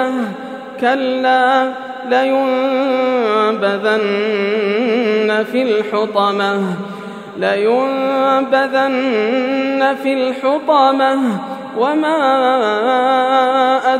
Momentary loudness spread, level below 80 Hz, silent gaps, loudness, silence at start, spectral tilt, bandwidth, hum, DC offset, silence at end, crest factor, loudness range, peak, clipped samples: 7 LU; -78 dBFS; none; -15 LUFS; 0 s; -5.5 dB/octave; 13 kHz; none; under 0.1%; 0 s; 14 dB; 2 LU; 0 dBFS; under 0.1%